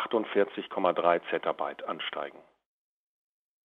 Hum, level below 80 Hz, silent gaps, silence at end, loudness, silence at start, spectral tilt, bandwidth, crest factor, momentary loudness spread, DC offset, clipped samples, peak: none; -80 dBFS; none; 1.25 s; -30 LUFS; 0 s; -7 dB/octave; 4.4 kHz; 22 dB; 9 LU; under 0.1%; under 0.1%; -8 dBFS